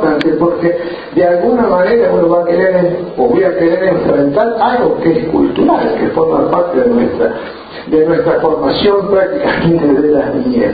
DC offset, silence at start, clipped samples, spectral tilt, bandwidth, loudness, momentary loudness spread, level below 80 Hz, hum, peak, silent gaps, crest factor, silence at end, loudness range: under 0.1%; 0 s; under 0.1%; -9.5 dB/octave; 5 kHz; -12 LUFS; 4 LU; -40 dBFS; none; 0 dBFS; none; 12 dB; 0 s; 1 LU